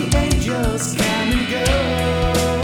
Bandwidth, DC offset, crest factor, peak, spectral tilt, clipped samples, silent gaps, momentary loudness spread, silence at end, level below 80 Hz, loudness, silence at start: over 20 kHz; under 0.1%; 14 dB; -4 dBFS; -4.5 dB/octave; under 0.1%; none; 2 LU; 0 s; -26 dBFS; -18 LUFS; 0 s